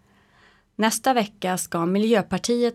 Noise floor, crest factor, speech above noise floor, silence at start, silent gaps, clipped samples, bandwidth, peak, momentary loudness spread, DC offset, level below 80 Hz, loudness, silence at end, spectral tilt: -57 dBFS; 16 dB; 35 dB; 0.8 s; none; under 0.1%; 16.5 kHz; -6 dBFS; 6 LU; under 0.1%; -58 dBFS; -23 LUFS; 0 s; -4.5 dB/octave